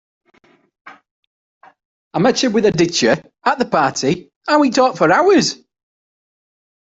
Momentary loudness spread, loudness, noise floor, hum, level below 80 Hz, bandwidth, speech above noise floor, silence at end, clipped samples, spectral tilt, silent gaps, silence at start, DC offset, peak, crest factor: 8 LU; -15 LUFS; -55 dBFS; none; -56 dBFS; 8.2 kHz; 40 dB; 1.45 s; under 0.1%; -4 dB/octave; 1.11-1.61 s, 1.85-2.11 s, 4.36-4.41 s; 0.85 s; under 0.1%; -2 dBFS; 16 dB